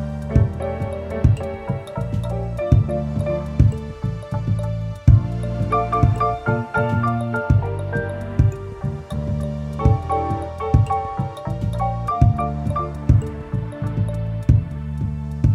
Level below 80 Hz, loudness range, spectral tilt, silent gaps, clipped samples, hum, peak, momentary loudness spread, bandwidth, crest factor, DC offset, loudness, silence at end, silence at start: -28 dBFS; 2 LU; -9 dB/octave; none; under 0.1%; none; -2 dBFS; 9 LU; 11 kHz; 18 dB; under 0.1%; -21 LUFS; 0 s; 0 s